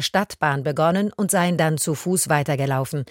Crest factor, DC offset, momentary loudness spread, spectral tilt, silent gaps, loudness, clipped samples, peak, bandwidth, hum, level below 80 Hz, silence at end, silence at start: 18 dB; under 0.1%; 3 LU; -4.5 dB/octave; none; -21 LUFS; under 0.1%; -4 dBFS; 17 kHz; none; -58 dBFS; 0.05 s; 0 s